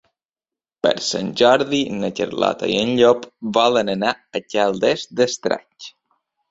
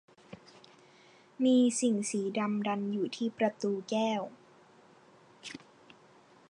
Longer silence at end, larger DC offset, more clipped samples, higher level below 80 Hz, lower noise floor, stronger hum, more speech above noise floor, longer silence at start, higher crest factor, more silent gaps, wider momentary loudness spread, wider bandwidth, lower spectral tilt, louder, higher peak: second, 0.6 s vs 0.95 s; neither; neither; first, -60 dBFS vs -82 dBFS; first, under -90 dBFS vs -60 dBFS; neither; first, over 71 dB vs 30 dB; first, 0.85 s vs 0.3 s; about the same, 18 dB vs 16 dB; neither; second, 9 LU vs 24 LU; second, 7.8 kHz vs 11 kHz; about the same, -4 dB/octave vs -4.5 dB/octave; first, -19 LUFS vs -31 LUFS; first, -2 dBFS vs -16 dBFS